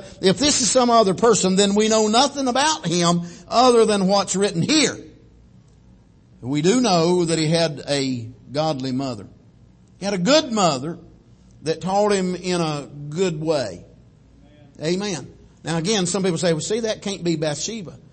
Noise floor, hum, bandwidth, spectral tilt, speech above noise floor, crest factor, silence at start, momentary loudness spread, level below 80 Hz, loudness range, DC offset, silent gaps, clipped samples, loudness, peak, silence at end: -51 dBFS; none; 8.8 kHz; -4 dB/octave; 31 dB; 18 dB; 0 s; 13 LU; -54 dBFS; 7 LU; under 0.1%; none; under 0.1%; -20 LUFS; -2 dBFS; 0.15 s